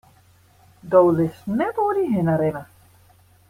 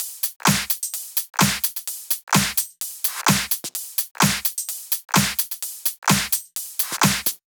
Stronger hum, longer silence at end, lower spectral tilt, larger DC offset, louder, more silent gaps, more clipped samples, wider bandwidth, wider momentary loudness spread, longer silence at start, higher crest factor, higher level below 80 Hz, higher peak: neither; first, 0.85 s vs 0.15 s; first, -9 dB/octave vs -2.5 dB/octave; neither; about the same, -20 LUFS vs -21 LUFS; second, none vs 0.36-0.40 s, 2.23-2.27 s, 4.11-4.15 s, 5.98-6.02 s; neither; second, 15.5 kHz vs over 20 kHz; about the same, 8 LU vs 6 LU; first, 0.85 s vs 0 s; about the same, 18 dB vs 20 dB; second, -58 dBFS vs -50 dBFS; about the same, -4 dBFS vs -2 dBFS